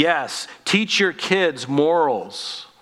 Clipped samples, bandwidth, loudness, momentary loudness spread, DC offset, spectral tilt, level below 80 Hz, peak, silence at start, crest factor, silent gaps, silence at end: under 0.1%; 14 kHz; -20 LUFS; 11 LU; under 0.1%; -3.5 dB/octave; -72 dBFS; -2 dBFS; 0 s; 18 dB; none; 0.15 s